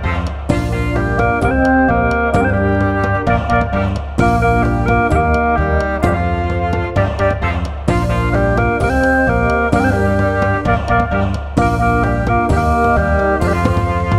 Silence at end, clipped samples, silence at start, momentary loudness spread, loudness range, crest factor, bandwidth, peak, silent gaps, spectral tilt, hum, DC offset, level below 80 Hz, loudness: 0 s; under 0.1%; 0 s; 4 LU; 1 LU; 14 dB; 12.5 kHz; 0 dBFS; none; -7.5 dB/octave; none; under 0.1%; -22 dBFS; -15 LUFS